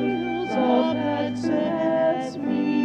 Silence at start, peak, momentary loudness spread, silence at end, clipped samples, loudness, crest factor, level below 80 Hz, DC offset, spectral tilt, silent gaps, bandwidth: 0 s; -8 dBFS; 5 LU; 0 s; under 0.1%; -23 LUFS; 14 dB; -60 dBFS; under 0.1%; -7 dB/octave; none; 8.8 kHz